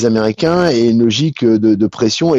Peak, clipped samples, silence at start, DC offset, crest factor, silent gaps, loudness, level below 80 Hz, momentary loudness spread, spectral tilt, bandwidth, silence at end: -2 dBFS; under 0.1%; 0 s; under 0.1%; 10 dB; none; -13 LUFS; -48 dBFS; 2 LU; -6 dB/octave; 7.8 kHz; 0 s